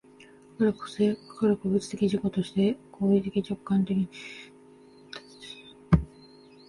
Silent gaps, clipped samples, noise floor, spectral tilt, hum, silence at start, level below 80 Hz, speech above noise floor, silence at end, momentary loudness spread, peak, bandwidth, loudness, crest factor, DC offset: none; under 0.1%; -53 dBFS; -7.5 dB/octave; none; 0.6 s; -46 dBFS; 27 dB; 0.65 s; 18 LU; -6 dBFS; 11.5 kHz; -27 LUFS; 22 dB; under 0.1%